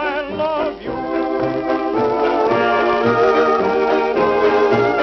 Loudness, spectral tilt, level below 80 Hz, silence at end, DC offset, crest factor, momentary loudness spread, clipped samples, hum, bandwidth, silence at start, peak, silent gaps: -17 LUFS; -6.5 dB/octave; -48 dBFS; 0 s; under 0.1%; 12 dB; 7 LU; under 0.1%; none; 6.4 kHz; 0 s; -4 dBFS; none